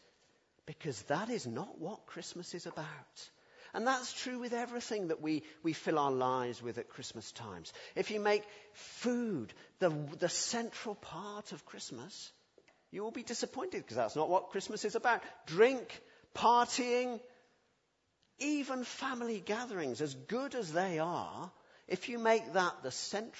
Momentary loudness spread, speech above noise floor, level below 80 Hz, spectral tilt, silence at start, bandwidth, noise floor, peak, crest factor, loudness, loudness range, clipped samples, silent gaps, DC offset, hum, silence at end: 16 LU; 42 dB; -80 dBFS; -4 dB/octave; 0.65 s; 8 kHz; -79 dBFS; -14 dBFS; 22 dB; -36 LUFS; 8 LU; under 0.1%; none; under 0.1%; none; 0 s